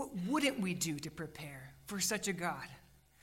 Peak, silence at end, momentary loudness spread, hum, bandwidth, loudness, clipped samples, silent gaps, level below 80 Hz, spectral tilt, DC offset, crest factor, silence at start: -20 dBFS; 0.35 s; 15 LU; none; 16 kHz; -37 LUFS; under 0.1%; none; -66 dBFS; -3.5 dB/octave; under 0.1%; 18 dB; 0 s